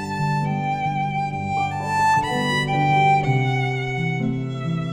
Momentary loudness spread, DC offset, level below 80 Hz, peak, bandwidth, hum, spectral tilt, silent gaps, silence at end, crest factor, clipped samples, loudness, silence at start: 7 LU; under 0.1%; -48 dBFS; -8 dBFS; 12.5 kHz; none; -6 dB/octave; none; 0 s; 14 dB; under 0.1%; -21 LUFS; 0 s